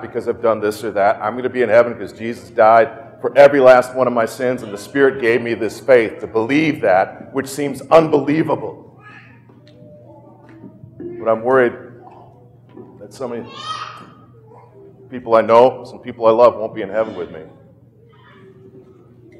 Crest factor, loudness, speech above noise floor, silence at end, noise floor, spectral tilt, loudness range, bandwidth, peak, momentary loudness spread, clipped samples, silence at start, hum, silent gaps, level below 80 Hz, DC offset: 18 dB; -16 LUFS; 32 dB; 1.95 s; -47 dBFS; -6 dB/octave; 10 LU; 14 kHz; 0 dBFS; 17 LU; under 0.1%; 0 s; none; none; -60 dBFS; under 0.1%